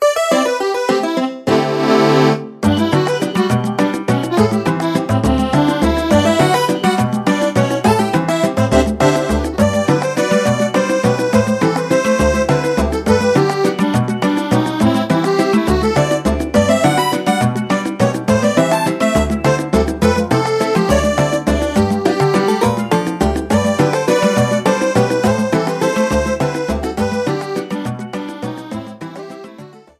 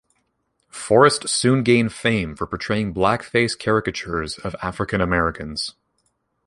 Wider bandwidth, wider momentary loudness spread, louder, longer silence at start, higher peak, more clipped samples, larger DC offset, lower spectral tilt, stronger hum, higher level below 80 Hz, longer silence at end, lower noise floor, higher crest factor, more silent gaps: first, 15.5 kHz vs 11.5 kHz; second, 5 LU vs 12 LU; first, -15 LUFS vs -20 LUFS; second, 0 s vs 0.75 s; about the same, 0 dBFS vs 0 dBFS; neither; neither; about the same, -5.5 dB/octave vs -4.5 dB/octave; neither; first, -32 dBFS vs -44 dBFS; second, 0.2 s vs 0.75 s; second, -38 dBFS vs -70 dBFS; second, 14 dB vs 22 dB; neither